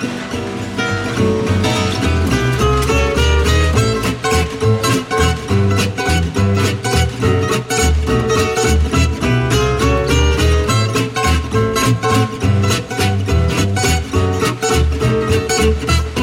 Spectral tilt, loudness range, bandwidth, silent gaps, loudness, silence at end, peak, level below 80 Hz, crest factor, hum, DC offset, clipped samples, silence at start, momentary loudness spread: -5 dB/octave; 1 LU; 16.5 kHz; none; -15 LUFS; 0 s; -2 dBFS; -22 dBFS; 12 dB; none; under 0.1%; under 0.1%; 0 s; 3 LU